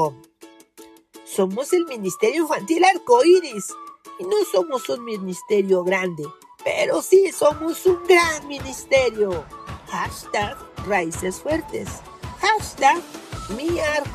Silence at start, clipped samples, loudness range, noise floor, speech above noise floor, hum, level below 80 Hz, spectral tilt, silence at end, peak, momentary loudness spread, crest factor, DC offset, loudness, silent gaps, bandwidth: 0 s; under 0.1%; 5 LU; -48 dBFS; 28 dB; none; -48 dBFS; -4 dB/octave; 0 s; -4 dBFS; 17 LU; 18 dB; under 0.1%; -21 LUFS; none; 14.5 kHz